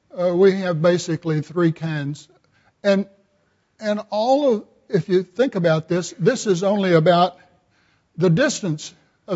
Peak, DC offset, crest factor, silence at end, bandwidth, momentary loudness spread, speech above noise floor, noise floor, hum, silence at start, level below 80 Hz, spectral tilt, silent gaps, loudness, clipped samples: -4 dBFS; under 0.1%; 18 dB; 0 s; 8 kHz; 11 LU; 46 dB; -65 dBFS; none; 0.15 s; -66 dBFS; -6 dB/octave; none; -20 LUFS; under 0.1%